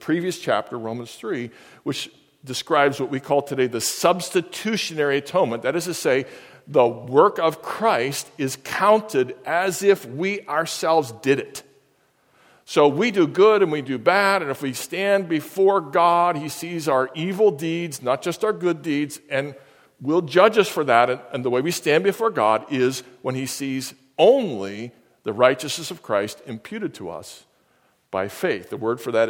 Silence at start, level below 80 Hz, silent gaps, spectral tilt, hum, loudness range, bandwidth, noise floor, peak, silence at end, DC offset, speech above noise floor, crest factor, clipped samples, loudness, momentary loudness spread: 0 s; -70 dBFS; none; -4.5 dB/octave; none; 5 LU; 17.5 kHz; -63 dBFS; 0 dBFS; 0 s; under 0.1%; 42 dB; 22 dB; under 0.1%; -21 LUFS; 13 LU